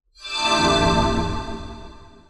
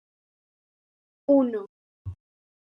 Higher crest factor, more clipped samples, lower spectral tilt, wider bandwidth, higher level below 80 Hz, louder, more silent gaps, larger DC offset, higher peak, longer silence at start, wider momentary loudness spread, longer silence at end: about the same, 16 dB vs 20 dB; neither; second, -4 dB/octave vs -11 dB/octave; first, 12 kHz vs 3.8 kHz; first, -34 dBFS vs -66 dBFS; first, -20 LUFS vs -24 LUFS; second, none vs 1.69-2.05 s; neither; first, -6 dBFS vs -10 dBFS; second, 0.2 s vs 1.3 s; about the same, 19 LU vs 21 LU; second, 0.2 s vs 0.6 s